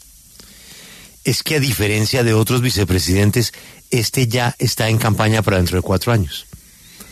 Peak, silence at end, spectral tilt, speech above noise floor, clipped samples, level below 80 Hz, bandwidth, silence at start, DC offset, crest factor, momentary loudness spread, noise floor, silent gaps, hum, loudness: -2 dBFS; 0 s; -5 dB/octave; 27 dB; under 0.1%; -38 dBFS; 14 kHz; 0.65 s; under 0.1%; 16 dB; 10 LU; -43 dBFS; none; none; -17 LUFS